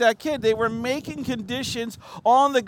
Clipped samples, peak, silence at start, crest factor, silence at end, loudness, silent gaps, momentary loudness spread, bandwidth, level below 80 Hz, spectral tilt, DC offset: under 0.1%; -6 dBFS; 0 s; 16 dB; 0 s; -24 LUFS; none; 11 LU; 17 kHz; -56 dBFS; -4 dB/octave; under 0.1%